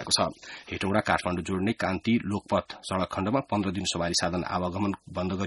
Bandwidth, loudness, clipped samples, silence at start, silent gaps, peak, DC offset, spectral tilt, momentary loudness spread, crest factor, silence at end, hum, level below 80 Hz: 11.5 kHz; -28 LUFS; under 0.1%; 0 s; none; -6 dBFS; under 0.1%; -4.5 dB/octave; 7 LU; 22 dB; 0 s; none; -54 dBFS